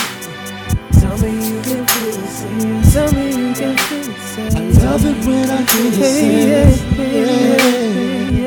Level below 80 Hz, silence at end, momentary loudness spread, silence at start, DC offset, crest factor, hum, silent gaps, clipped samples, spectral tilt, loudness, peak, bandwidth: -24 dBFS; 0 s; 10 LU; 0 s; under 0.1%; 14 dB; none; none; 0.4%; -5.5 dB/octave; -14 LUFS; 0 dBFS; 19.5 kHz